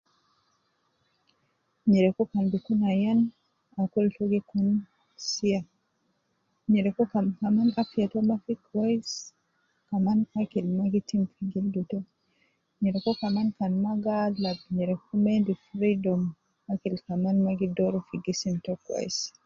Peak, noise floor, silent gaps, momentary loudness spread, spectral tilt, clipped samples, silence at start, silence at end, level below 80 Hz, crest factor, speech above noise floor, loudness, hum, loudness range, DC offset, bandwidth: -12 dBFS; -74 dBFS; none; 8 LU; -6.5 dB/octave; under 0.1%; 1.85 s; 0.15 s; -66 dBFS; 16 dB; 48 dB; -28 LUFS; none; 3 LU; under 0.1%; 7.4 kHz